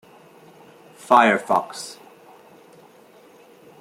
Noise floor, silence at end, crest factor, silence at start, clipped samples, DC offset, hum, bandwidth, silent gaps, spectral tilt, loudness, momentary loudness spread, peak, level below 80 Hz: -50 dBFS; 1.9 s; 24 dB; 1.1 s; under 0.1%; under 0.1%; none; 16 kHz; none; -4 dB/octave; -18 LUFS; 21 LU; -2 dBFS; -70 dBFS